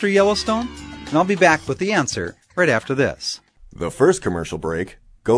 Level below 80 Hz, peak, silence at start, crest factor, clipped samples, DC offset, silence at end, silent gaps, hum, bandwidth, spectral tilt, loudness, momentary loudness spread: -46 dBFS; 0 dBFS; 0 s; 20 dB; under 0.1%; under 0.1%; 0 s; none; none; 11 kHz; -4.5 dB/octave; -20 LUFS; 14 LU